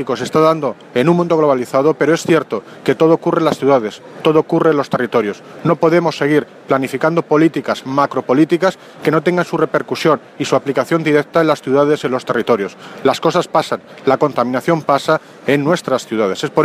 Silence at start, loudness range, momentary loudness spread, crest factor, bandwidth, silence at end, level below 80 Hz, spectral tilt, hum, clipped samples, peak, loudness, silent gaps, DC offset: 0 s; 2 LU; 6 LU; 14 dB; 15.5 kHz; 0 s; -60 dBFS; -6 dB/octave; none; under 0.1%; 0 dBFS; -15 LUFS; none; under 0.1%